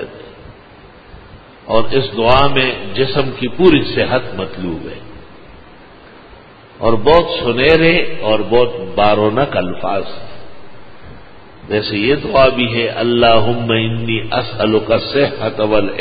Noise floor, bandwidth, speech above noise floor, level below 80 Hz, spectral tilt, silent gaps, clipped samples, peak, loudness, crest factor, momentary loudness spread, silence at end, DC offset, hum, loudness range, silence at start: -40 dBFS; 5 kHz; 27 dB; -36 dBFS; -8.5 dB/octave; none; under 0.1%; 0 dBFS; -14 LUFS; 14 dB; 12 LU; 0 s; under 0.1%; none; 5 LU; 0 s